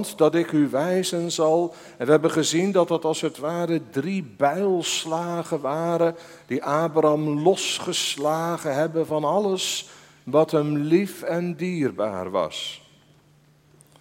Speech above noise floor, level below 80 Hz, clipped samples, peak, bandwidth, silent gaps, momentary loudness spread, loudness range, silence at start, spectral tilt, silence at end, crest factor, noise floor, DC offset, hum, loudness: 34 dB; -70 dBFS; under 0.1%; -2 dBFS; 16.5 kHz; none; 8 LU; 3 LU; 0 s; -4.5 dB/octave; 1.25 s; 20 dB; -57 dBFS; under 0.1%; none; -23 LUFS